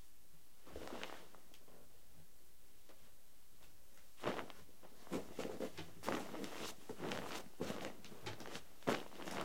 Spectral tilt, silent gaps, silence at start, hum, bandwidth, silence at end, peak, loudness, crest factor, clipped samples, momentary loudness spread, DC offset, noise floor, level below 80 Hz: -4 dB/octave; none; 0 s; none; 16.5 kHz; 0 s; -18 dBFS; -47 LUFS; 32 dB; under 0.1%; 22 LU; 0.4%; -67 dBFS; -72 dBFS